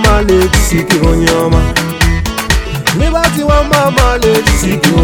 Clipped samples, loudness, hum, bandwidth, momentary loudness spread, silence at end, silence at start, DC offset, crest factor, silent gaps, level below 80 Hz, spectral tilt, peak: 0.3%; -10 LUFS; none; 19 kHz; 4 LU; 0 s; 0 s; under 0.1%; 10 dB; none; -16 dBFS; -4.5 dB/octave; 0 dBFS